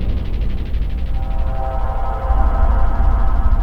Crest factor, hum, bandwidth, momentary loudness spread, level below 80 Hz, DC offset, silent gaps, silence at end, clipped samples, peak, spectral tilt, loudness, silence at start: 12 dB; none; 4.6 kHz; 6 LU; -16 dBFS; under 0.1%; none; 0 s; under 0.1%; -2 dBFS; -9 dB/octave; -21 LUFS; 0 s